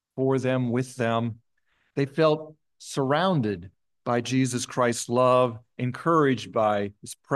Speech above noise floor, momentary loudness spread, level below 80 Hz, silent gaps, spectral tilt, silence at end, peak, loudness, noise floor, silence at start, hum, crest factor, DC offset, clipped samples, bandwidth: 47 dB; 12 LU; -70 dBFS; none; -5.5 dB/octave; 0 s; -8 dBFS; -25 LUFS; -71 dBFS; 0.15 s; none; 16 dB; under 0.1%; under 0.1%; 12.5 kHz